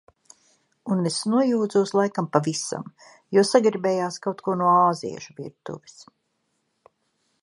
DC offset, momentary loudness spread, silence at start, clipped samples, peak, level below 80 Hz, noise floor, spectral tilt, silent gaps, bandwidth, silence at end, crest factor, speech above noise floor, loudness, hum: under 0.1%; 19 LU; 0.85 s; under 0.1%; -2 dBFS; -72 dBFS; -74 dBFS; -5 dB/octave; none; 11.5 kHz; 1.65 s; 22 dB; 51 dB; -22 LUFS; none